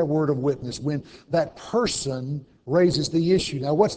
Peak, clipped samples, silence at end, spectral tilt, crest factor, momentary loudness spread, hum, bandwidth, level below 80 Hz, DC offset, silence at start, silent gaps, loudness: -6 dBFS; under 0.1%; 0 s; -5.5 dB/octave; 18 dB; 9 LU; none; 8 kHz; -50 dBFS; under 0.1%; 0 s; none; -24 LUFS